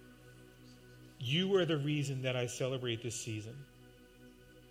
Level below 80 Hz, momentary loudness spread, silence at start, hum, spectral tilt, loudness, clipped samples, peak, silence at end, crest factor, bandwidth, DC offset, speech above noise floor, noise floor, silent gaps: -68 dBFS; 26 LU; 0 s; none; -5 dB/octave; -35 LUFS; under 0.1%; -20 dBFS; 0 s; 18 dB; 16 kHz; under 0.1%; 24 dB; -59 dBFS; none